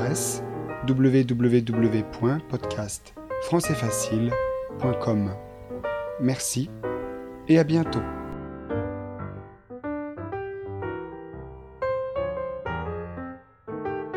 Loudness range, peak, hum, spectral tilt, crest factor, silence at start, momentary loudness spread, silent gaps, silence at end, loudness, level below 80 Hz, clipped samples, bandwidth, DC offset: 9 LU; -8 dBFS; none; -6 dB/octave; 18 dB; 0 s; 16 LU; none; 0 s; -27 LUFS; -48 dBFS; under 0.1%; 15.5 kHz; under 0.1%